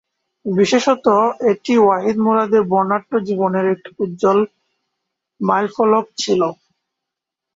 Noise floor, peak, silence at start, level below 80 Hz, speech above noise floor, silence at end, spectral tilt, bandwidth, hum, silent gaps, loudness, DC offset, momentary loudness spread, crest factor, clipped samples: -83 dBFS; -2 dBFS; 0.45 s; -62 dBFS; 67 dB; 1 s; -5.5 dB/octave; 7.8 kHz; none; none; -17 LUFS; under 0.1%; 8 LU; 16 dB; under 0.1%